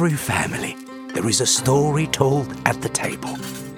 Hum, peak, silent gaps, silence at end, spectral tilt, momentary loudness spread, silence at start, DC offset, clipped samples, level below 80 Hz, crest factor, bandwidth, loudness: none; 0 dBFS; none; 0 s; -4 dB/octave; 12 LU; 0 s; under 0.1%; under 0.1%; -50 dBFS; 22 dB; 18 kHz; -21 LUFS